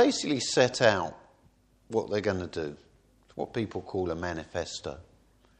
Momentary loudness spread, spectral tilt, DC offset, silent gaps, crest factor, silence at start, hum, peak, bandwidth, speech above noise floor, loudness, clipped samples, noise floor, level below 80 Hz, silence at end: 14 LU; -4 dB/octave; under 0.1%; none; 22 dB; 0 s; none; -8 dBFS; 10 kHz; 34 dB; -30 LUFS; under 0.1%; -63 dBFS; -58 dBFS; 0.6 s